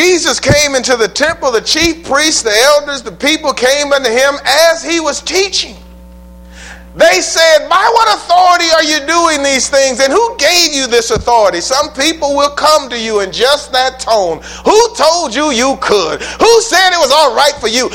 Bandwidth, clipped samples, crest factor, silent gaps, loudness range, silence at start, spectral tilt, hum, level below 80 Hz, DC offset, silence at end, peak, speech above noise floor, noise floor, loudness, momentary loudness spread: 17.5 kHz; 0.3%; 10 dB; none; 3 LU; 0 s; -2 dB/octave; none; -38 dBFS; under 0.1%; 0 s; 0 dBFS; 23 dB; -33 dBFS; -10 LUFS; 6 LU